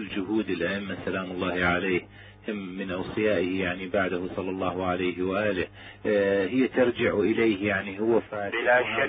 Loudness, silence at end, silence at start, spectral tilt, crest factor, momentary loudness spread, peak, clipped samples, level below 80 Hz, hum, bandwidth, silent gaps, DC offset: -27 LUFS; 0 s; 0 s; -10 dB/octave; 18 dB; 9 LU; -10 dBFS; under 0.1%; -52 dBFS; none; 4.8 kHz; none; under 0.1%